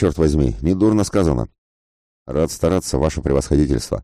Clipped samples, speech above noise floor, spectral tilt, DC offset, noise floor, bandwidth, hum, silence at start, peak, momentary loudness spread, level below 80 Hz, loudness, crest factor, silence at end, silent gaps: under 0.1%; over 73 dB; -6.5 dB/octave; under 0.1%; under -90 dBFS; 14.5 kHz; none; 0 s; -4 dBFS; 6 LU; -28 dBFS; -19 LUFS; 14 dB; 0 s; 1.58-2.26 s